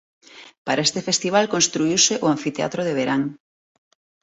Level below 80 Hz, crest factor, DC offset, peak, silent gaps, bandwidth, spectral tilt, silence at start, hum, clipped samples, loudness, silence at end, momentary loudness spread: -64 dBFS; 20 dB; under 0.1%; -4 dBFS; 0.58-0.65 s; 8.2 kHz; -3 dB/octave; 0.35 s; none; under 0.1%; -20 LUFS; 0.85 s; 8 LU